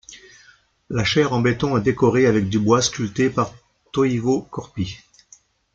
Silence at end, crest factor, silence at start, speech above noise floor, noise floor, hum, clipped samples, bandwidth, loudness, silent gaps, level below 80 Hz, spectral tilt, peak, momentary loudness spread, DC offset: 0.8 s; 18 dB; 0.1 s; 35 dB; -54 dBFS; none; under 0.1%; 9 kHz; -20 LUFS; none; -50 dBFS; -5.5 dB/octave; -2 dBFS; 12 LU; under 0.1%